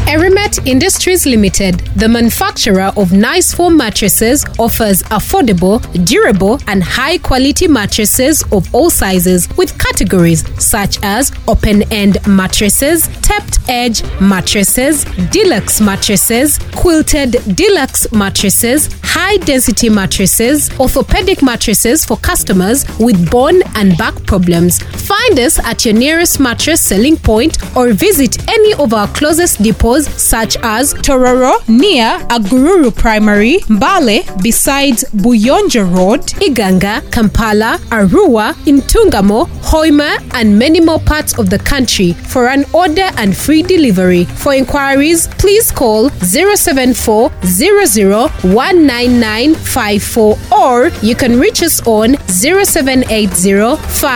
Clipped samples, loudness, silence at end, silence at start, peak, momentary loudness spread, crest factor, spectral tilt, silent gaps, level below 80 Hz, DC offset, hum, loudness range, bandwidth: under 0.1%; -9 LUFS; 0 s; 0 s; 0 dBFS; 4 LU; 10 dB; -4 dB/octave; none; -22 dBFS; 0.5%; none; 1 LU; over 20 kHz